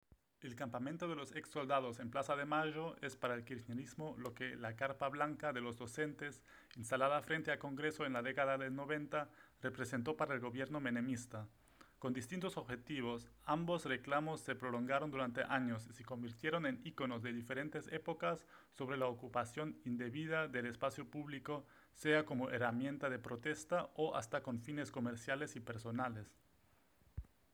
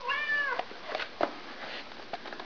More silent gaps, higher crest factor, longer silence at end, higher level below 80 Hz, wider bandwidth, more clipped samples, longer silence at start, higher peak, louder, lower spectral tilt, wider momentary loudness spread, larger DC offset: neither; about the same, 22 dB vs 24 dB; first, 0.25 s vs 0 s; about the same, -72 dBFS vs -68 dBFS; first, over 20 kHz vs 5.4 kHz; neither; first, 0.4 s vs 0 s; second, -20 dBFS vs -12 dBFS; second, -42 LUFS vs -34 LUFS; first, -5.5 dB/octave vs -3 dB/octave; second, 10 LU vs 13 LU; second, under 0.1% vs 0.4%